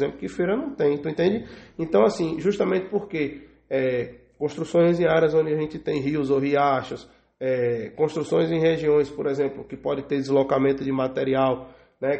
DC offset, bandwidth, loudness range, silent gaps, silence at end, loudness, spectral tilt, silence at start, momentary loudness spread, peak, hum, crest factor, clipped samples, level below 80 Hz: under 0.1%; 8.4 kHz; 2 LU; none; 0 s; -24 LUFS; -7 dB/octave; 0 s; 10 LU; -6 dBFS; none; 18 dB; under 0.1%; -56 dBFS